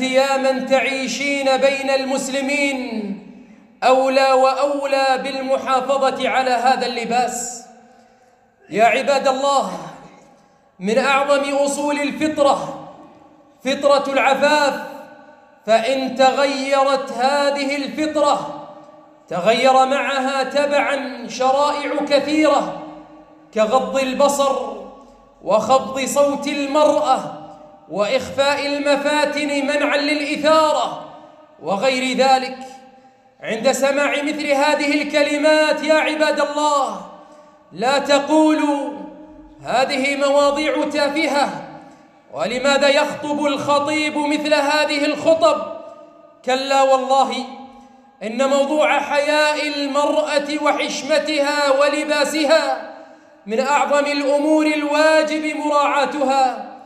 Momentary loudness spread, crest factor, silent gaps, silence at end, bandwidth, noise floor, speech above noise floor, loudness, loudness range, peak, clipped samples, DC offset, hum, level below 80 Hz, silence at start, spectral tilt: 12 LU; 16 dB; none; 0 s; 14.5 kHz; -54 dBFS; 37 dB; -18 LUFS; 2 LU; -4 dBFS; under 0.1%; under 0.1%; none; -62 dBFS; 0 s; -3 dB/octave